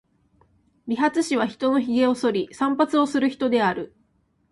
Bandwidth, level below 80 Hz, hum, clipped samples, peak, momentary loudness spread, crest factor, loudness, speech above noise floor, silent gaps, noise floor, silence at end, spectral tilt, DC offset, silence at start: 11.5 kHz; -64 dBFS; none; under 0.1%; -8 dBFS; 8 LU; 16 dB; -22 LUFS; 44 dB; none; -66 dBFS; 0.65 s; -5 dB/octave; under 0.1%; 0.85 s